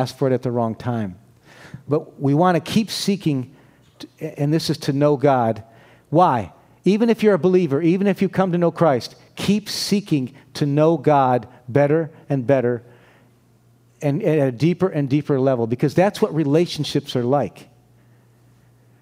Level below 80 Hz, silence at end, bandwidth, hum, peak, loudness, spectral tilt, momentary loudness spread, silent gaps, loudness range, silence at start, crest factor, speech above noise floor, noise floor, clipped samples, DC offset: -60 dBFS; 1.4 s; 16 kHz; none; -2 dBFS; -20 LUFS; -6.5 dB/octave; 9 LU; none; 3 LU; 0 s; 18 dB; 36 dB; -55 dBFS; under 0.1%; under 0.1%